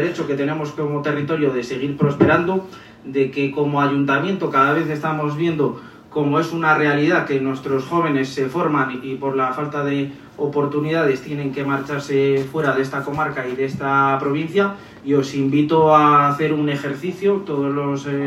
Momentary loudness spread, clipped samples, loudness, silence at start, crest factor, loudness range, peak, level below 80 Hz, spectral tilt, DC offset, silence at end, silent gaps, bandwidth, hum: 8 LU; under 0.1%; -19 LUFS; 0 s; 18 dB; 4 LU; 0 dBFS; -58 dBFS; -7 dB/octave; under 0.1%; 0 s; none; 13 kHz; none